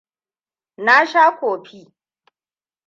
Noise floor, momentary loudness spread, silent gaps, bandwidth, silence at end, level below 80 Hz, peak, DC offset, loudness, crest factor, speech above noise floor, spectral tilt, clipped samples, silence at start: under -90 dBFS; 12 LU; none; 7.4 kHz; 1.25 s; -80 dBFS; -2 dBFS; under 0.1%; -15 LUFS; 18 dB; over 74 dB; -3 dB/octave; under 0.1%; 0.8 s